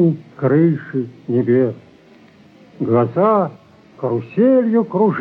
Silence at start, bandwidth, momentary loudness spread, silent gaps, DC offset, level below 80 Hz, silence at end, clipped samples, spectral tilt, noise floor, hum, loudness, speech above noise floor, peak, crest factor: 0 s; 5 kHz; 11 LU; none; under 0.1%; -66 dBFS; 0 s; under 0.1%; -11.5 dB/octave; -47 dBFS; none; -17 LUFS; 31 dB; -4 dBFS; 12 dB